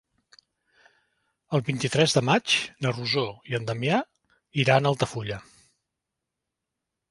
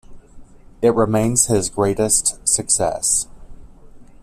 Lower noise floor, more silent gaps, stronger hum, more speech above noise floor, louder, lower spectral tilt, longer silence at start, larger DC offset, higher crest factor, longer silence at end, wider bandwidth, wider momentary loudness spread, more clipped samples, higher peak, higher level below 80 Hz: first, -85 dBFS vs -41 dBFS; neither; neither; first, 60 dB vs 23 dB; second, -25 LUFS vs -17 LUFS; about the same, -4.5 dB/octave vs -4 dB/octave; first, 1.5 s vs 0.1 s; neither; first, 24 dB vs 18 dB; first, 1.7 s vs 0.2 s; second, 11.5 kHz vs 15 kHz; first, 12 LU vs 4 LU; neither; about the same, -4 dBFS vs -2 dBFS; second, -62 dBFS vs -42 dBFS